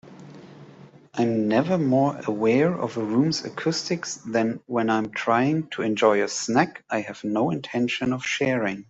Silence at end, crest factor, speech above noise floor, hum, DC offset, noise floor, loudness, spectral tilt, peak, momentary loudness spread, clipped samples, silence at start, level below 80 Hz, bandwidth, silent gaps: 0.05 s; 20 dB; 25 dB; none; under 0.1%; -48 dBFS; -24 LUFS; -5 dB/octave; -4 dBFS; 7 LU; under 0.1%; 0.05 s; -64 dBFS; 8 kHz; none